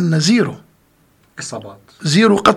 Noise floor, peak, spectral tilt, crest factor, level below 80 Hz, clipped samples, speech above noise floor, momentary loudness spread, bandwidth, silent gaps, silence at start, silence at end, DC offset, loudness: -55 dBFS; 0 dBFS; -5 dB/octave; 16 dB; -54 dBFS; under 0.1%; 40 dB; 22 LU; 13 kHz; none; 0 s; 0 s; under 0.1%; -14 LUFS